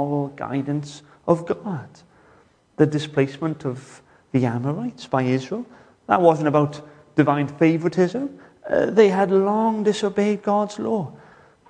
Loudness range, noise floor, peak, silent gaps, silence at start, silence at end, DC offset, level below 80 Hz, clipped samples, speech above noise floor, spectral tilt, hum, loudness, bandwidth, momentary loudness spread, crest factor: 6 LU; -56 dBFS; -2 dBFS; none; 0 s; 0.55 s; under 0.1%; -62 dBFS; under 0.1%; 35 dB; -7 dB/octave; none; -21 LUFS; 9.8 kHz; 16 LU; 20 dB